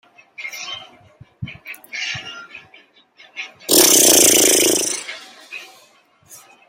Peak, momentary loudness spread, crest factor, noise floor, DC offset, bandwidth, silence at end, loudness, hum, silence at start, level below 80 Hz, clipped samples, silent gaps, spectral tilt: 0 dBFS; 26 LU; 20 dB; -53 dBFS; under 0.1%; 17 kHz; 0.35 s; -12 LUFS; none; 0.4 s; -58 dBFS; under 0.1%; none; -0.5 dB/octave